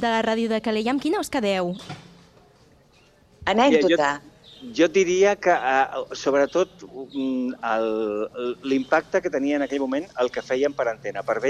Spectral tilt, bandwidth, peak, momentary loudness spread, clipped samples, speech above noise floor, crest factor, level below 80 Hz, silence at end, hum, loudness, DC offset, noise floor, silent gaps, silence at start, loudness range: -4.5 dB/octave; 13.5 kHz; -6 dBFS; 11 LU; under 0.1%; 34 dB; 18 dB; -58 dBFS; 0 s; none; -23 LUFS; under 0.1%; -56 dBFS; none; 0 s; 4 LU